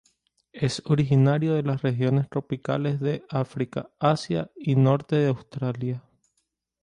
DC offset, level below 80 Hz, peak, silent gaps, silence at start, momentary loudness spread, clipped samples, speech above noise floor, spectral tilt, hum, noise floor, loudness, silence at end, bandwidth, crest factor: under 0.1%; -60 dBFS; -8 dBFS; none; 0.55 s; 10 LU; under 0.1%; 52 dB; -7.5 dB/octave; none; -76 dBFS; -25 LUFS; 0.85 s; 10 kHz; 18 dB